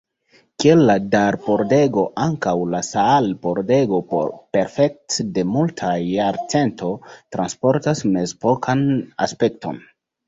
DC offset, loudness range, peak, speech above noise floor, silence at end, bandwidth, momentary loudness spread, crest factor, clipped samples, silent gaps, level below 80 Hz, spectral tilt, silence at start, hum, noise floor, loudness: under 0.1%; 4 LU; -2 dBFS; 39 dB; 0.5 s; 8 kHz; 8 LU; 18 dB; under 0.1%; none; -54 dBFS; -6 dB/octave; 0.6 s; none; -57 dBFS; -19 LUFS